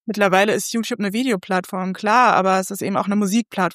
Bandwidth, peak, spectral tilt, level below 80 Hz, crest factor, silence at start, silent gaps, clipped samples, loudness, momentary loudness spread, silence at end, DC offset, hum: 15.5 kHz; -2 dBFS; -4.5 dB/octave; -70 dBFS; 18 dB; 0.05 s; none; under 0.1%; -19 LUFS; 8 LU; 0 s; under 0.1%; none